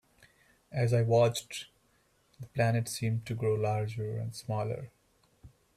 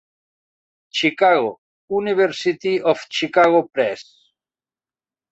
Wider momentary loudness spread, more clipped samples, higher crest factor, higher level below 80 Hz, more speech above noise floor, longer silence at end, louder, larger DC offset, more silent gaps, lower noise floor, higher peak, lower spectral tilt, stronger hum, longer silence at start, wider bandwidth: first, 16 LU vs 10 LU; neither; about the same, 18 dB vs 18 dB; about the same, -64 dBFS vs -66 dBFS; second, 39 dB vs over 72 dB; second, 0.3 s vs 1.3 s; second, -31 LUFS vs -19 LUFS; neither; second, none vs 1.58-1.88 s; second, -70 dBFS vs under -90 dBFS; second, -14 dBFS vs -2 dBFS; first, -6 dB/octave vs -4.5 dB/octave; neither; second, 0.7 s vs 0.95 s; first, 14.5 kHz vs 8.2 kHz